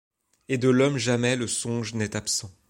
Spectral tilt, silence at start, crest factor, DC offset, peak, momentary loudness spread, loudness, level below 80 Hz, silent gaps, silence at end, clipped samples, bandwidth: -4.5 dB/octave; 0.5 s; 18 dB; under 0.1%; -8 dBFS; 8 LU; -25 LUFS; -62 dBFS; none; 0.2 s; under 0.1%; 16.5 kHz